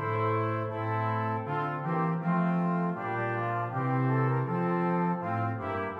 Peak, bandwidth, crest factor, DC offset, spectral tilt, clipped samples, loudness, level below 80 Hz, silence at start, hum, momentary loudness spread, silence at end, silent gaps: -16 dBFS; 4.9 kHz; 12 dB; under 0.1%; -10 dB/octave; under 0.1%; -30 LUFS; -70 dBFS; 0 s; none; 4 LU; 0 s; none